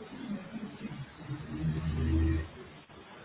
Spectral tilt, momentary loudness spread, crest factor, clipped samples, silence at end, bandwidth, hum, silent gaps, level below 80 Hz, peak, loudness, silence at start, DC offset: -7.5 dB/octave; 20 LU; 16 dB; under 0.1%; 0 s; 4 kHz; none; none; -40 dBFS; -18 dBFS; -36 LUFS; 0 s; under 0.1%